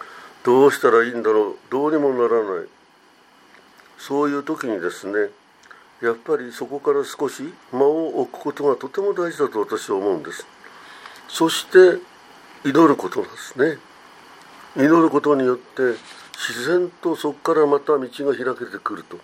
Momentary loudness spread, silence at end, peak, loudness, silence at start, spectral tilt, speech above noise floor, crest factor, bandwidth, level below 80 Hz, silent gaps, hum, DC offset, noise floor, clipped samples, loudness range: 15 LU; 0.05 s; 0 dBFS; -20 LUFS; 0 s; -5 dB/octave; 34 dB; 20 dB; 16 kHz; -74 dBFS; none; none; under 0.1%; -53 dBFS; under 0.1%; 6 LU